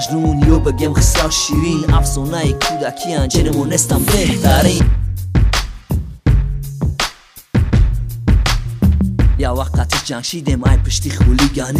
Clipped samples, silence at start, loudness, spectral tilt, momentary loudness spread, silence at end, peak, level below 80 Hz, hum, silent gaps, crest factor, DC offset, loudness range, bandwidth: under 0.1%; 0 s; -15 LUFS; -5 dB/octave; 7 LU; 0 s; 0 dBFS; -18 dBFS; none; none; 14 dB; under 0.1%; 3 LU; 16 kHz